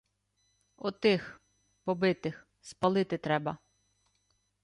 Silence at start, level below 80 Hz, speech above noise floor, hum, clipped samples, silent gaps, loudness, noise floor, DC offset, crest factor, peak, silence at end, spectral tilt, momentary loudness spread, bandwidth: 0.85 s; -70 dBFS; 46 dB; 50 Hz at -60 dBFS; under 0.1%; none; -31 LUFS; -76 dBFS; under 0.1%; 20 dB; -14 dBFS; 1.1 s; -6.5 dB/octave; 19 LU; 11 kHz